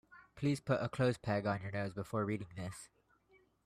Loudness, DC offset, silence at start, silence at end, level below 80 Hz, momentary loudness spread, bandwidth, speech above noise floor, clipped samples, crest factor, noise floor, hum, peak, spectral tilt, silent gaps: -38 LUFS; under 0.1%; 0.1 s; 0.8 s; -68 dBFS; 12 LU; 14 kHz; 34 dB; under 0.1%; 18 dB; -71 dBFS; none; -20 dBFS; -6.5 dB/octave; none